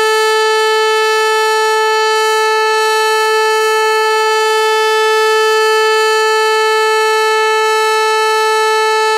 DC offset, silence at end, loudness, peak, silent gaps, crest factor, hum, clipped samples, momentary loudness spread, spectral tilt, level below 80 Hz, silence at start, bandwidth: under 0.1%; 0 s; -11 LUFS; -2 dBFS; none; 10 dB; none; under 0.1%; 1 LU; 2.5 dB/octave; -66 dBFS; 0 s; 16 kHz